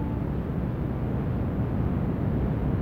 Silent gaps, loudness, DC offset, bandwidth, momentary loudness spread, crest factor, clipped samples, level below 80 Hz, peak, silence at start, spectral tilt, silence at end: none; -28 LUFS; 0.2%; 4.8 kHz; 3 LU; 12 dB; under 0.1%; -34 dBFS; -14 dBFS; 0 s; -10.5 dB/octave; 0 s